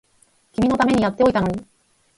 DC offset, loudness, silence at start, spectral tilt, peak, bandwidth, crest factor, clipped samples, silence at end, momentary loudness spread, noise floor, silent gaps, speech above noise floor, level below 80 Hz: under 0.1%; -19 LUFS; 0.6 s; -6.5 dB/octave; -4 dBFS; 11.5 kHz; 18 dB; under 0.1%; 0.55 s; 13 LU; -60 dBFS; none; 42 dB; -46 dBFS